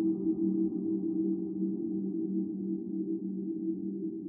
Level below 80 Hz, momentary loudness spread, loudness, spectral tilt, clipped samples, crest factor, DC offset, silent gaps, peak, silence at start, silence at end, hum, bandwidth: -74 dBFS; 5 LU; -33 LUFS; -18 dB/octave; under 0.1%; 12 dB; under 0.1%; none; -20 dBFS; 0 s; 0 s; none; 1.3 kHz